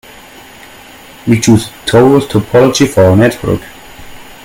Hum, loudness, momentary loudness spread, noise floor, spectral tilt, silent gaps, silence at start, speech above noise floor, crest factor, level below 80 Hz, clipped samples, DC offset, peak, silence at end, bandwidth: none; -9 LUFS; 10 LU; -35 dBFS; -6 dB/octave; none; 1.25 s; 26 dB; 10 dB; -38 dBFS; 0.3%; under 0.1%; 0 dBFS; 0.1 s; 17 kHz